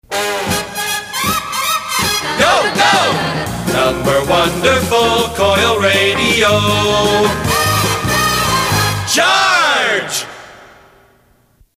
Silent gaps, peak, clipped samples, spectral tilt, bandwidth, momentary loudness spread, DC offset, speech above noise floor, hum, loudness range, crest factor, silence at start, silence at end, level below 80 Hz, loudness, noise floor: none; 0 dBFS; under 0.1%; -3 dB/octave; 16 kHz; 7 LU; under 0.1%; 40 dB; none; 2 LU; 14 dB; 0.1 s; 1.1 s; -36 dBFS; -13 LUFS; -52 dBFS